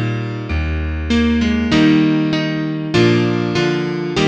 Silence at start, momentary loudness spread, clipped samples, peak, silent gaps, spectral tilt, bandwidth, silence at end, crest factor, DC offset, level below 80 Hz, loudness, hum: 0 s; 9 LU; under 0.1%; -2 dBFS; none; -6.5 dB/octave; 8.6 kHz; 0 s; 14 dB; under 0.1%; -28 dBFS; -16 LUFS; none